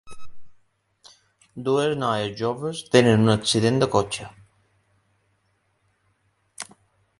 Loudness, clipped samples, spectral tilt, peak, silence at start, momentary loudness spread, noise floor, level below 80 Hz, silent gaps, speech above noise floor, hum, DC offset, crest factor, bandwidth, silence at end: -22 LUFS; under 0.1%; -5 dB/octave; -2 dBFS; 0.05 s; 21 LU; -69 dBFS; -56 dBFS; none; 48 dB; none; under 0.1%; 24 dB; 11.5 kHz; 0.55 s